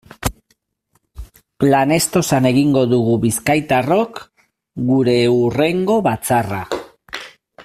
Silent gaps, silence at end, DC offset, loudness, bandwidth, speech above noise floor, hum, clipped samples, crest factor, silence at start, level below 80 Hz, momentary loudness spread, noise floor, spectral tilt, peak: none; 0 s; under 0.1%; -16 LUFS; 16 kHz; 50 dB; none; under 0.1%; 16 dB; 0.2 s; -44 dBFS; 14 LU; -65 dBFS; -5.5 dB/octave; -2 dBFS